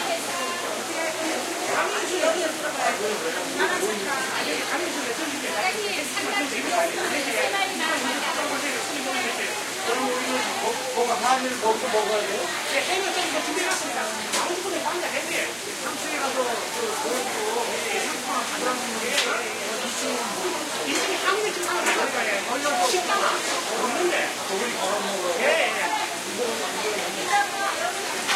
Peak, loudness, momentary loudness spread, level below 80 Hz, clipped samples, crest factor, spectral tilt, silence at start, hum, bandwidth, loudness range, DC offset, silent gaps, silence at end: -8 dBFS; -24 LUFS; 4 LU; -72 dBFS; under 0.1%; 18 dB; -1 dB/octave; 0 s; none; 16 kHz; 2 LU; under 0.1%; none; 0 s